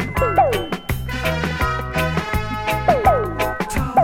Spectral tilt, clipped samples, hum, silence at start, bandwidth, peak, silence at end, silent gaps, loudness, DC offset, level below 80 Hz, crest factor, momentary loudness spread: -5.5 dB/octave; under 0.1%; none; 0 s; 17.5 kHz; -2 dBFS; 0 s; none; -20 LUFS; under 0.1%; -30 dBFS; 16 dB; 7 LU